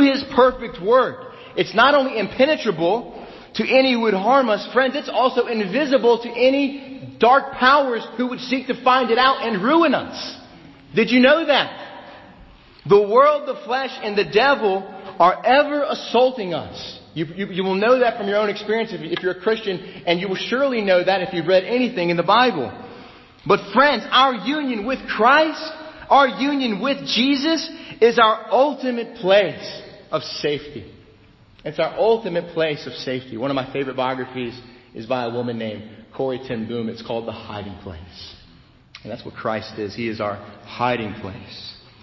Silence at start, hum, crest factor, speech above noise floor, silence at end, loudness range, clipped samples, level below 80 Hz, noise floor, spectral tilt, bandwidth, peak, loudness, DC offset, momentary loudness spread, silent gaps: 0 s; none; 18 dB; 31 dB; 0.3 s; 10 LU; under 0.1%; -54 dBFS; -50 dBFS; -5.5 dB/octave; 6.2 kHz; -2 dBFS; -19 LUFS; under 0.1%; 19 LU; none